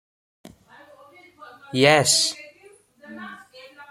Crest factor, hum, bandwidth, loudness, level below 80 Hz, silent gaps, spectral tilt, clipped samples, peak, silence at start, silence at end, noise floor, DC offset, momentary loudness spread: 24 dB; none; 16.5 kHz; -18 LUFS; -66 dBFS; none; -2.5 dB/octave; under 0.1%; 0 dBFS; 0.45 s; 0.05 s; -53 dBFS; under 0.1%; 25 LU